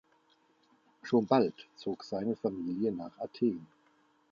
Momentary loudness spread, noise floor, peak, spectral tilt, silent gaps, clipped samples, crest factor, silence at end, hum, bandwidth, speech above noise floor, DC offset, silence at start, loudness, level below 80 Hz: 14 LU; -69 dBFS; -12 dBFS; -7.5 dB/octave; none; under 0.1%; 24 dB; 0.65 s; none; 7.2 kHz; 37 dB; under 0.1%; 1.05 s; -33 LUFS; -74 dBFS